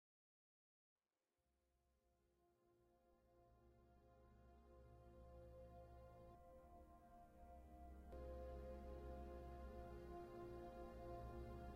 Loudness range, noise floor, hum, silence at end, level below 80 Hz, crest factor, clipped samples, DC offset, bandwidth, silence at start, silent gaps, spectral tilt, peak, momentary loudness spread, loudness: 10 LU; under -90 dBFS; none; 0 s; -64 dBFS; 16 dB; under 0.1%; under 0.1%; 15.5 kHz; 2.05 s; none; -8 dB/octave; -44 dBFS; 11 LU; -60 LUFS